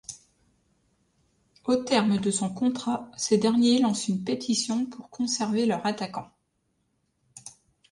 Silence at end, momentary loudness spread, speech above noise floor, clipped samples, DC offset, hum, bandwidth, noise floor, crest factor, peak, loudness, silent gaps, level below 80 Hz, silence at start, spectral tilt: 0.4 s; 19 LU; 49 dB; under 0.1%; under 0.1%; none; 11.5 kHz; -74 dBFS; 18 dB; -10 dBFS; -26 LUFS; none; -68 dBFS; 0.1 s; -4.5 dB/octave